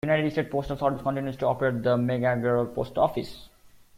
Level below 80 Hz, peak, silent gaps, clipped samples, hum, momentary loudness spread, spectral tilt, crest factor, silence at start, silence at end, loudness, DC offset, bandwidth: -52 dBFS; -10 dBFS; none; under 0.1%; none; 5 LU; -8 dB/octave; 16 dB; 0.05 s; 0.3 s; -26 LUFS; under 0.1%; 16 kHz